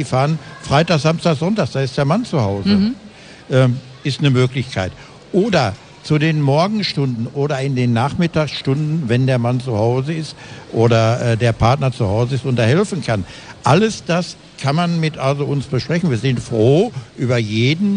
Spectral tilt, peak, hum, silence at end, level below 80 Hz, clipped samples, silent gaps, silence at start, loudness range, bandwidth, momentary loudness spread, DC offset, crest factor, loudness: -6.5 dB/octave; -2 dBFS; none; 0 s; -44 dBFS; under 0.1%; none; 0 s; 1 LU; 10 kHz; 8 LU; under 0.1%; 14 dB; -17 LUFS